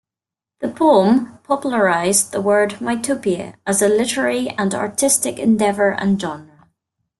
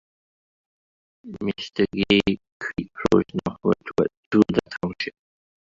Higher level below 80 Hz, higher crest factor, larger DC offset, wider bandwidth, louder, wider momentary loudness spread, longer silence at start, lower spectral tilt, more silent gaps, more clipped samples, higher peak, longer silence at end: second, -58 dBFS vs -50 dBFS; second, 16 dB vs 22 dB; neither; first, 12.5 kHz vs 7.6 kHz; first, -17 LUFS vs -24 LUFS; second, 8 LU vs 12 LU; second, 0.6 s vs 1.25 s; second, -4 dB/octave vs -6.5 dB/octave; second, none vs 2.52-2.60 s, 4.17-4.31 s; neither; about the same, -2 dBFS vs -2 dBFS; about the same, 0.75 s vs 0.7 s